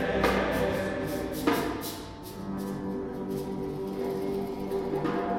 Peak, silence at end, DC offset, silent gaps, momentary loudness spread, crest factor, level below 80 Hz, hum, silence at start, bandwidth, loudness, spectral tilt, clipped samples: -10 dBFS; 0 s; under 0.1%; none; 9 LU; 20 dB; -48 dBFS; none; 0 s; 18 kHz; -31 LUFS; -5.5 dB/octave; under 0.1%